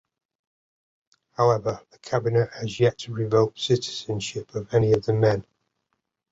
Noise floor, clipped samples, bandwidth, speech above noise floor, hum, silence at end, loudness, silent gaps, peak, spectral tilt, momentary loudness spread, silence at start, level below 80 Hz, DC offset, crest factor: -78 dBFS; under 0.1%; 8 kHz; 54 dB; none; 0.9 s; -24 LUFS; none; -6 dBFS; -6 dB/octave; 9 LU; 1.4 s; -56 dBFS; under 0.1%; 18 dB